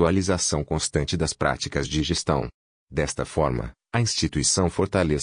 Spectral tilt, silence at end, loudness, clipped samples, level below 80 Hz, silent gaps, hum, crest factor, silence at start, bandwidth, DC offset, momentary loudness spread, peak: -4 dB/octave; 0 s; -24 LUFS; under 0.1%; -40 dBFS; 2.54-2.87 s; none; 18 dB; 0 s; 10 kHz; under 0.1%; 6 LU; -6 dBFS